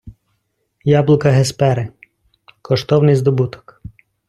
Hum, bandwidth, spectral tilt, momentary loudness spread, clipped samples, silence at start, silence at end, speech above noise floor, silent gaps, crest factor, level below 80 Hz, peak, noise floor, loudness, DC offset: none; 12 kHz; -7 dB/octave; 11 LU; under 0.1%; 0.05 s; 0.8 s; 54 dB; none; 14 dB; -48 dBFS; -2 dBFS; -68 dBFS; -15 LUFS; under 0.1%